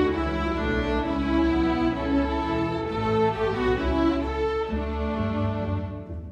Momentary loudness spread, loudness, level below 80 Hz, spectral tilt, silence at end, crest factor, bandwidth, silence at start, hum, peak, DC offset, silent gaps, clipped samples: 5 LU; -25 LUFS; -34 dBFS; -8 dB/octave; 0 s; 14 dB; 8.6 kHz; 0 s; none; -12 dBFS; under 0.1%; none; under 0.1%